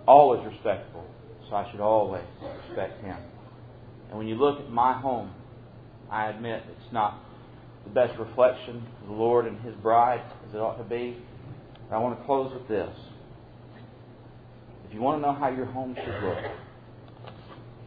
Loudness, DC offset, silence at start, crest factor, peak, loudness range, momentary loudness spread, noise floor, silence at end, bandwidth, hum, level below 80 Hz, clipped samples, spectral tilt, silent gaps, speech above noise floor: -27 LUFS; under 0.1%; 0 s; 24 dB; -2 dBFS; 6 LU; 24 LU; -48 dBFS; 0 s; 4.9 kHz; none; -58 dBFS; under 0.1%; -10 dB/octave; none; 22 dB